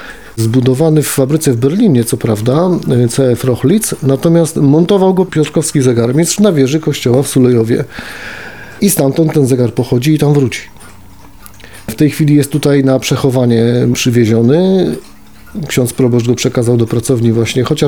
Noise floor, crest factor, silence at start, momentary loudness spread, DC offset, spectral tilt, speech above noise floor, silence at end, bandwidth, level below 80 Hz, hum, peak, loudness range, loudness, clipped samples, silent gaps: -37 dBFS; 10 dB; 0 s; 7 LU; 1%; -6 dB/octave; 27 dB; 0 s; 20 kHz; -44 dBFS; none; 0 dBFS; 3 LU; -11 LUFS; under 0.1%; none